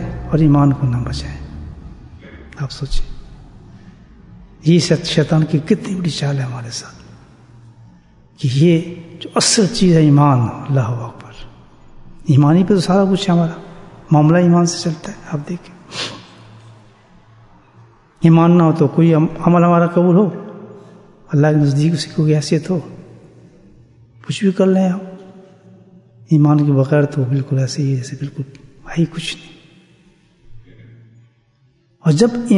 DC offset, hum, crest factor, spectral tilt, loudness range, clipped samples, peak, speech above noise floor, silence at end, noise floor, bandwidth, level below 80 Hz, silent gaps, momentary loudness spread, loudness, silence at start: under 0.1%; none; 16 dB; -6.5 dB/octave; 11 LU; under 0.1%; 0 dBFS; 42 dB; 0 s; -56 dBFS; 11 kHz; -38 dBFS; none; 19 LU; -15 LUFS; 0 s